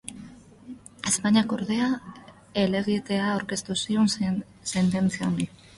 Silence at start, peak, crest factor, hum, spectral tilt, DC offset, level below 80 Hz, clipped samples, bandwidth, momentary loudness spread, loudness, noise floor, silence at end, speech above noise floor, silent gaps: 0.05 s; -10 dBFS; 18 dB; none; -4.5 dB/octave; under 0.1%; -58 dBFS; under 0.1%; 11.5 kHz; 18 LU; -26 LUFS; -46 dBFS; 0.3 s; 21 dB; none